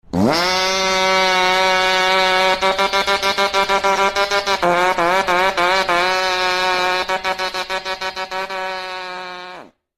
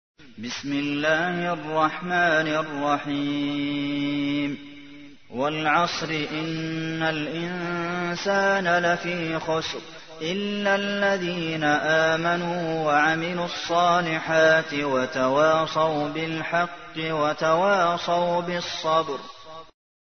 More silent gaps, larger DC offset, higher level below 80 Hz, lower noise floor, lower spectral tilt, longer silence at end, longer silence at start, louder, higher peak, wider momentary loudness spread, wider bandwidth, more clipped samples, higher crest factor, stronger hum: neither; about the same, 0.3% vs 0.2%; first, -48 dBFS vs -60 dBFS; second, -38 dBFS vs -46 dBFS; second, -2.5 dB/octave vs -5 dB/octave; second, 0.3 s vs 0.45 s; about the same, 0.1 s vs 0.2 s; first, -16 LUFS vs -24 LUFS; first, -2 dBFS vs -6 dBFS; about the same, 10 LU vs 9 LU; first, 16.5 kHz vs 6.6 kHz; neither; about the same, 16 dB vs 18 dB; neither